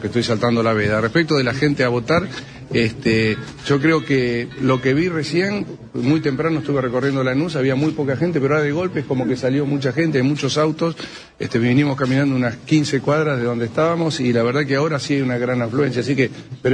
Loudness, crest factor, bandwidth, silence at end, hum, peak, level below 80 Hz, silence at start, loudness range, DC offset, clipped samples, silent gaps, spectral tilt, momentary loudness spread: -19 LUFS; 14 dB; 10.5 kHz; 0 s; none; -4 dBFS; -50 dBFS; 0 s; 1 LU; under 0.1%; under 0.1%; none; -6.5 dB/octave; 5 LU